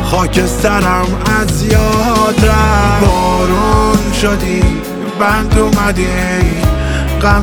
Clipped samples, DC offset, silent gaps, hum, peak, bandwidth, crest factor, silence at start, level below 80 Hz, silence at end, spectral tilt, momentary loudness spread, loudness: under 0.1%; under 0.1%; none; none; 0 dBFS; 20 kHz; 10 dB; 0 s; -18 dBFS; 0 s; -5.5 dB/octave; 4 LU; -12 LUFS